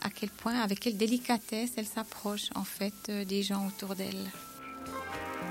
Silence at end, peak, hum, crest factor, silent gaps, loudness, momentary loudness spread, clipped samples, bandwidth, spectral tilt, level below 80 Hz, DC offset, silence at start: 0 s; -12 dBFS; none; 22 dB; none; -35 LUFS; 9 LU; under 0.1%; 16.5 kHz; -4 dB/octave; -66 dBFS; under 0.1%; 0 s